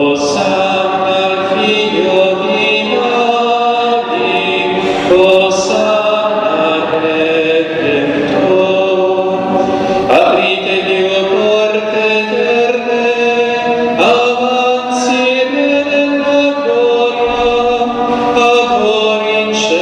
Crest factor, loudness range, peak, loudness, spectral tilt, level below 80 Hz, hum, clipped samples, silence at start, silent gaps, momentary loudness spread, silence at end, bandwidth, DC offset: 12 dB; 1 LU; 0 dBFS; -11 LUFS; -4 dB/octave; -46 dBFS; none; under 0.1%; 0 s; none; 4 LU; 0 s; 9.8 kHz; under 0.1%